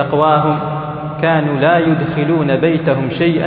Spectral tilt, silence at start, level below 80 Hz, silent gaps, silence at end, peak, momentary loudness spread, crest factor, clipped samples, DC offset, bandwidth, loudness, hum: -10.5 dB/octave; 0 s; -46 dBFS; none; 0 s; 0 dBFS; 7 LU; 14 dB; under 0.1%; under 0.1%; 4.7 kHz; -15 LUFS; none